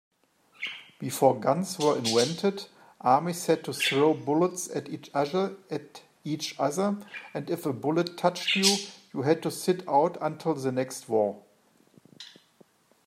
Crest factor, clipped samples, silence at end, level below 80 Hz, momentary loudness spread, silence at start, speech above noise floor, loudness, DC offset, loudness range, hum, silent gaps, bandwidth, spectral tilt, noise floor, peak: 22 dB; under 0.1%; 0.8 s; -76 dBFS; 14 LU; 0.6 s; 36 dB; -27 LUFS; under 0.1%; 4 LU; none; none; 16 kHz; -4 dB/octave; -63 dBFS; -6 dBFS